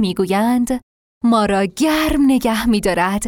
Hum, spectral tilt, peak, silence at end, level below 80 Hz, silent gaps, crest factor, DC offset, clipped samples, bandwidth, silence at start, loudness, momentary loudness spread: none; -5 dB/octave; -4 dBFS; 0 s; -36 dBFS; 0.83-1.21 s; 12 dB; under 0.1%; under 0.1%; 18 kHz; 0 s; -16 LUFS; 5 LU